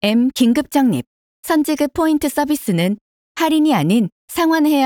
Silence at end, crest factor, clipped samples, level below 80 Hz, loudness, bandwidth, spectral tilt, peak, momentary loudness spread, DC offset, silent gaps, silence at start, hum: 0 s; 14 dB; under 0.1%; -52 dBFS; -17 LUFS; 19 kHz; -5.5 dB/octave; -4 dBFS; 8 LU; under 0.1%; 1.07-1.43 s, 3.01-3.35 s, 4.12-4.28 s; 0.05 s; none